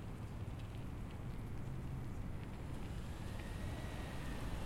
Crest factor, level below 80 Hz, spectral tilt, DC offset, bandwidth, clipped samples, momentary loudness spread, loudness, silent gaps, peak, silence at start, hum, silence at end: 12 dB; -50 dBFS; -6.5 dB/octave; under 0.1%; 16 kHz; under 0.1%; 2 LU; -47 LUFS; none; -32 dBFS; 0 s; none; 0 s